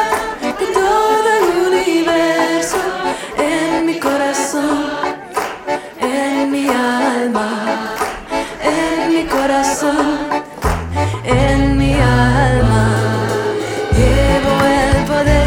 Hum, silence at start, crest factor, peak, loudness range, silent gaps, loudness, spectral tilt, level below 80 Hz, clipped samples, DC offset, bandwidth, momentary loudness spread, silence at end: none; 0 s; 14 dB; 0 dBFS; 4 LU; none; -15 LUFS; -5.5 dB/octave; -26 dBFS; under 0.1%; under 0.1%; 18 kHz; 7 LU; 0 s